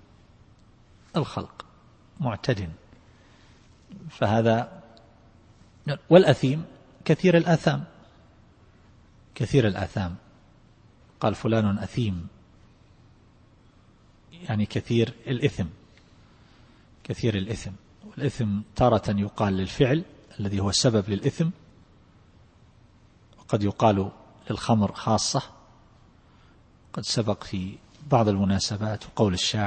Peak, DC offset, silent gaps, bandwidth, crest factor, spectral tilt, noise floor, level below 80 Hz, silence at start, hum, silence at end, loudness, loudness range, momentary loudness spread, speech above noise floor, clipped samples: -2 dBFS; under 0.1%; none; 8.8 kHz; 24 dB; -6 dB/octave; -56 dBFS; -52 dBFS; 1.15 s; none; 0 s; -25 LUFS; 9 LU; 17 LU; 32 dB; under 0.1%